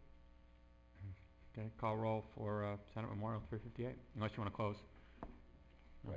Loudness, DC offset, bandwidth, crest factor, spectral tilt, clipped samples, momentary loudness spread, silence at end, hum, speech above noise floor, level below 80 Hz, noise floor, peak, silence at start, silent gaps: -45 LUFS; under 0.1%; 7.4 kHz; 18 dB; -9 dB/octave; under 0.1%; 19 LU; 0 s; none; 21 dB; -62 dBFS; -65 dBFS; -28 dBFS; 0 s; none